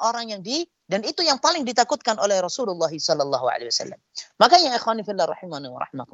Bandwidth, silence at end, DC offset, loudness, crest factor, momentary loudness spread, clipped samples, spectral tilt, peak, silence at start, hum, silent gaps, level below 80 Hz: 8.2 kHz; 0.1 s; under 0.1%; -21 LUFS; 22 dB; 16 LU; under 0.1%; -2.5 dB/octave; 0 dBFS; 0 s; none; none; -74 dBFS